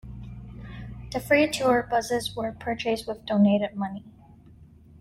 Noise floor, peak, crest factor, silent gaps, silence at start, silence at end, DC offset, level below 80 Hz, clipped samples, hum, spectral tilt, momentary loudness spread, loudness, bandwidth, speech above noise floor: -51 dBFS; -8 dBFS; 20 dB; none; 0.05 s; 0.35 s; under 0.1%; -50 dBFS; under 0.1%; none; -5.5 dB/octave; 20 LU; -25 LUFS; 15.5 kHz; 26 dB